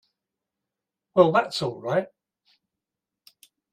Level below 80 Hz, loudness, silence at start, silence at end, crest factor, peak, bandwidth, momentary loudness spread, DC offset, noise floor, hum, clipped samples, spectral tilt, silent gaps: -70 dBFS; -23 LUFS; 1.15 s; 1.65 s; 24 dB; -4 dBFS; 14.5 kHz; 10 LU; under 0.1%; -87 dBFS; none; under 0.1%; -6 dB/octave; none